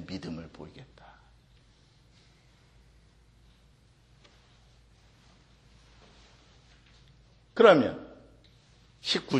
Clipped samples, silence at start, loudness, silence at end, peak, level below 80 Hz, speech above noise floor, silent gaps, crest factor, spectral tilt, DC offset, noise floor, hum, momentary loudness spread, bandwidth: under 0.1%; 0 s; -25 LUFS; 0 s; -6 dBFS; -62 dBFS; 35 dB; none; 28 dB; -5 dB/octave; under 0.1%; -61 dBFS; none; 29 LU; 10 kHz